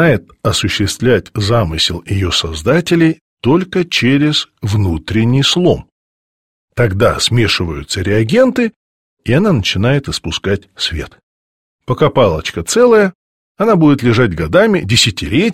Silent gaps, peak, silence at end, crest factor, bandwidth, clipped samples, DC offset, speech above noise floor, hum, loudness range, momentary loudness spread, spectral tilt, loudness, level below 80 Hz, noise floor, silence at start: 3.21-3.37 s, 5.92-6.68 s, 8.76-9.17 s, 11.23-11.79 s, 13.15-13.55 s; 0 dBFS; 0 s; 14 dB; 16 kHz; under 0.1%; 0.4%; over 77 dB; none; 4 LU; 8 LU; -5 dB/octave; -13 LUFS; -34 dBFS; under -90 dBFS; 0 s